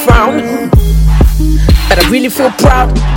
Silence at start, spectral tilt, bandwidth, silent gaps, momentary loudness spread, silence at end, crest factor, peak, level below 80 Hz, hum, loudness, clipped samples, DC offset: 0 s; -5.5 dB/octave; 17.5 kHz; none; 3 LU; 0 s; 8 dB; 0 dBFS; -10 dBFS; none; -9 LUFS; 5%; under 0.1%